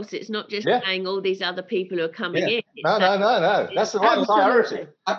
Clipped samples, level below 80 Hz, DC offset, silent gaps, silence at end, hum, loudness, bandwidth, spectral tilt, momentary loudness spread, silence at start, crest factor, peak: under 0.1%; -78 dBFS; under 0.1%; none; 0 s; none; -22 LUFS; 7.4 kHz; -4.5 dB/octave; 9 LU; 0 s; 18 dB; -4 dBFS